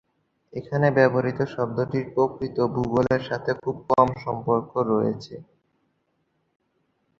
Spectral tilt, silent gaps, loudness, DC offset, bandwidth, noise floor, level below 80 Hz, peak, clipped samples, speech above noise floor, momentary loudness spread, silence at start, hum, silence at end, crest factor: -8.5 dB/octave; none; -24 LUFS; under 0.1%; 7.2 kHz; -72 dBFS; -56 dBFS; -2 dBFS; under 0.1%; 48 dB; 9 LU; 0.55 s; none; 1.8 s; 22 dB